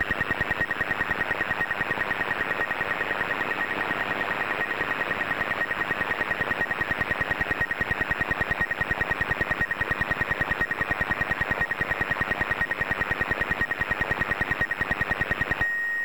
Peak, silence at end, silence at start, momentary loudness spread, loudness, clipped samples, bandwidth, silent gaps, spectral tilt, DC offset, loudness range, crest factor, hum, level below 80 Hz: -14 dBFS; 0 s; 0 s; 1 LU; -26 LUFS; under 0.1%; over 20 kHz; none; -5 dB/octave; 0.5%; 1 LU; 14 dB; none; -44 dBFS